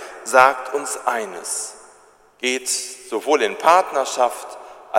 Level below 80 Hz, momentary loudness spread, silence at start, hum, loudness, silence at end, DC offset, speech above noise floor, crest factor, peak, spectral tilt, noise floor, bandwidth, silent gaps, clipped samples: -68 dBFS; 13 LU; 0 s; none; -19 LUFS; 0 s; under 0.1%; 32 dB; 20 dB; 0 dBFS; -1 dB/octave; -52 dBFS; 16.5 kHz; none; under 0.1%